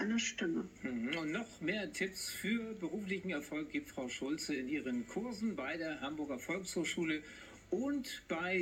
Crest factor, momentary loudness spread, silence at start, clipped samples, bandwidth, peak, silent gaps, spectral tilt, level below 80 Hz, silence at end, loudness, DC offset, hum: 16 dB; 5 LU; 0 s; under 0.1%; 16.5 kHz; -24 dBFS; none; -4 dB/octave; -68 dBFS; 0 s; -39 LUFS; under 0.1%; none